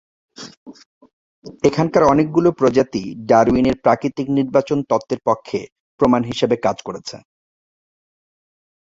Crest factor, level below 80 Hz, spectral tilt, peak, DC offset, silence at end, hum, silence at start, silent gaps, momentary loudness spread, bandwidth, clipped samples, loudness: 18 dB; -48 dBFS; -6.5 dB/octave; -2 dBFS; under 0.1%; 1.8 s; none; 0.4 s; 0.57-0.66 s, 0.86-1.01 s, 1.13-1.42 s, 5.72-5.98 s; 16 LU; 7.8 kHz; under 0.1%; -17 LUFS